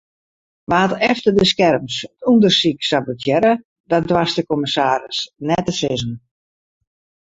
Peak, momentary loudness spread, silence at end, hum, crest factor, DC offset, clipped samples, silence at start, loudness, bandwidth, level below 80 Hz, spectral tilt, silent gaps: -2 dBFS; 10 LU; 1.1 s; none; 16 dB; under 0.1%; under 0.1%; 0.7 s; -17 LUFS; 8 kHz; -50 dBFS; -5 dB/octave; 3.65-3.84 s